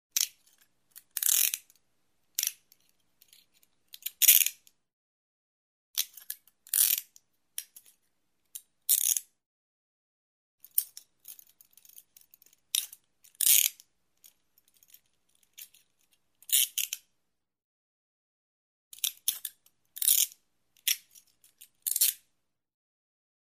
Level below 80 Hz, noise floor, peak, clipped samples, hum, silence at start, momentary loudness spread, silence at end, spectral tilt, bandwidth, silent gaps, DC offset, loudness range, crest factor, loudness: under -90 dBFS; -83 dBFS; -4 dBFS; under 0.1%; none; 0.15 s; 25 LU; 1.3 s; 6.5 dB/octave; 16 kHz; 4.93-5.94 s, 9.46-10.58 s, 17.64-18.91 s; under 0.1%; 7 LU; 30 dB; -26 LUFS